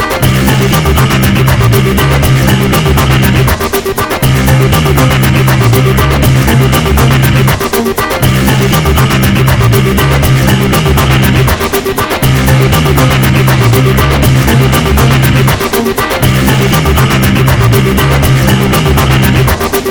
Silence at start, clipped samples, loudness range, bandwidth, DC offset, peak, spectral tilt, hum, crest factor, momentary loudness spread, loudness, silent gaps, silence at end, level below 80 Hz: 0 s; 1%; 1 LU; over 20 kHz; under 0.1%; 0 dBFS; -5.5 dB/octave; none; 8 dB; 3 LU; -8 LUFS; none; 0 s; -16 dBFS